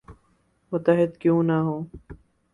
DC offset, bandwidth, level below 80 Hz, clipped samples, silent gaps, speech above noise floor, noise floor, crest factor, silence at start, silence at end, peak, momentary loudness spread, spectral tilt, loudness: under 0.1%; 3.9 kHz; -54 dBFS; under 0.1%; none; 43 dB; -65 dBFS; 18 dB; 0.1 s; 0.4 s; -6 dBFS; 12 LU; -10 dB/octave; -23 LUFS